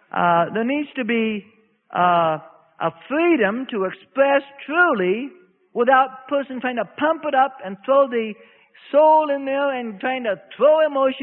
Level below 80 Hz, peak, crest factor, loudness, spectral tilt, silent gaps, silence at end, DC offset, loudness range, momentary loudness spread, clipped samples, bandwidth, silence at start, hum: -68 dBFS; -4 dBFS; 16 dB; -20 LUFS; -10.5 dB/octave; none; 0 s; under 0.1%; 2 LU; 10 LU; under 0.1%; 4.2 kHz; 0.15 s; none